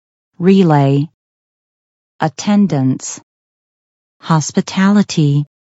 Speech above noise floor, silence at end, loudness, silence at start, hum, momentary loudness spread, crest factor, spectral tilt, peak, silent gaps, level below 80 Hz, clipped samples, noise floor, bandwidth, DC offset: over 78 dB; 0.3 s; -14 LUFS; 0.4 s; none; 12 LU; 16 dB; -6.5 dB/octave; 0 dBFS; 1.14-2.19 s, 3.23-4.20 s; -60 dBFS; under 0.1%; under -90 dBFS; 8 kHz; under 0.1%